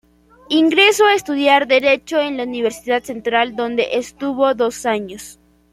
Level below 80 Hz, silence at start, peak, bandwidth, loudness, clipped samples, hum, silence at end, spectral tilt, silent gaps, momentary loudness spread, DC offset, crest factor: -56 dBFS; 0.5 s; -2 dBFS; 15.5 kHz; -16 LUFS; under 0.1%; none; 0.4 s; -2.5 dB/octave; none; 10 LU; under 0.1%; 16 dB